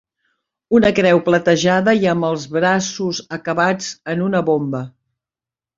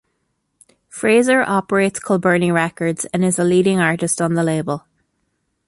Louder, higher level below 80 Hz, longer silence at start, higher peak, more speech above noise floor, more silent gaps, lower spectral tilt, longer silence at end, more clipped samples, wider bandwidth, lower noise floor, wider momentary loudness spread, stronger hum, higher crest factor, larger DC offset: about the same, -17 LUFS vs -17 LUFS; about the same, -54 dBFS vs -58 dBFS; second, 0.7 s vs 0.95 s; about the same, -2 dBFS vs -2 dBFS; first, 74 dB vs 54 dB; neither; about the same, -5 dB/octave vs -5 dB/octave; about the same, 0.9 s vs 0.9 s; neither; second, 7.6 kHz vs 11.5 kHz; first, -90 dBFS vs -70 dBFS; about the same, 10 LU vs 8 LU; neither; about the same, 16 dB vs 16 dB; neither